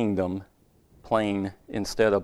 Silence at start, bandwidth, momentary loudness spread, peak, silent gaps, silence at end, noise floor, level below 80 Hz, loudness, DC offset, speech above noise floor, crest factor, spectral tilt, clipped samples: 0 s; 15 kHz; 9 LU; -8 dBFS; none; 0 s; -59 dBFS; -52 dBFS; -28 LUFS; under 0.1%; 33 dB; 20 dB; -6 dB/octave; under 0.1%